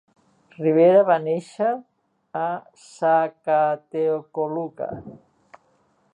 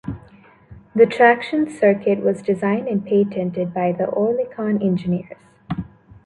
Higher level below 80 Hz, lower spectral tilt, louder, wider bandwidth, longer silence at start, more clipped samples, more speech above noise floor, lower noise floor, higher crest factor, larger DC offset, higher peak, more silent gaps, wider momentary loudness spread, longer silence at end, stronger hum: second, -66 dBFS vs -52 dBFS; about the same, -7.5 dB/octave vs -8 dB/octave; second, -22 LUFS vs -19 LUFS; about the same, 10 kHz vs 10.5 kHz; first, 0.6 s vs 0.05 s; neither; first, 42 dB vs 30 dB; first, -64 dBFS vs -48 dBFS; about the same, 18 dB vs 18 dB; neither; second, -6 dBFS vs -2 dBFS; neither; about the same, 17 LU vs 15 LU; first, 1 s vs 0.4 s; neither